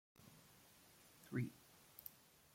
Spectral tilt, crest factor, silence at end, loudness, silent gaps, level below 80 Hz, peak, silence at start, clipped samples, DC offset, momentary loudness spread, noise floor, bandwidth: -6 dB/octave; 24 dB; 0.4 s; -50 LUFS; none; -82 dBFS; -30 dBFS; 0.2 s; under 0.1%; under 0.1%; 19 LU; -68 dBFS; 16.5 kHz